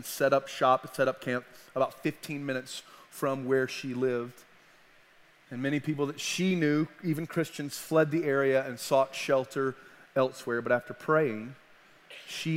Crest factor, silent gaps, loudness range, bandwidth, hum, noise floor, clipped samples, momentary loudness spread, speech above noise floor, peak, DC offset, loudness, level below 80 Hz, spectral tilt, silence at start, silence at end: 20 dB; none; 5 LU; 16 kHz; none; -60 dBFS; under 0.1%; 13 LU; 30 dB; -12 dBFS; under 0.1%; -30 LUFS; -76 dBFS; -5 dB/octave; 0 s; 0 s